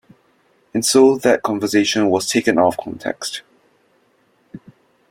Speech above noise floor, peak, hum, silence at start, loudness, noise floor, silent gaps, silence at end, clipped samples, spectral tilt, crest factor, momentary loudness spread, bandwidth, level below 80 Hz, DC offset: 43 dB; -2 dBFS; none; 0.75 s; -17 LUFS; -60 dBFS; none; 0.5 s; under 0.1%; -3.5 dB/octave; 18 dB; 14 LU; 16.5 kHz; -60 dBFS; under 0.1%